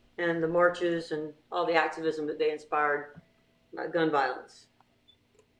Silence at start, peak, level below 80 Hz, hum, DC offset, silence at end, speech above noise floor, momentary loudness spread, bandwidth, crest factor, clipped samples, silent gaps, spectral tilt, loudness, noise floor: 0.2 s; -8 dBFS; -72 dBFS; none; under 0.1%; 1.15 s; 36 dB; 11 LU; 9.8 kHz; 22 dB; under 0.1%; none; -5.5 dB/octave; -29 LUFS; -65 dBFS